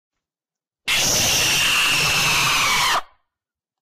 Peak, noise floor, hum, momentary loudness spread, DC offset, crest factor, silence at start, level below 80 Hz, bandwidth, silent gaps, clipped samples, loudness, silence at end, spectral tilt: -10 dBFS; under -90 dBFS; none; 5 LU; under 0.1%; 10 dB; 0.85 s; -44 dBFS; 15.5 kHz; none; under 0.1%; -16 LUFS; 0.75 s; -0.5 dB/octave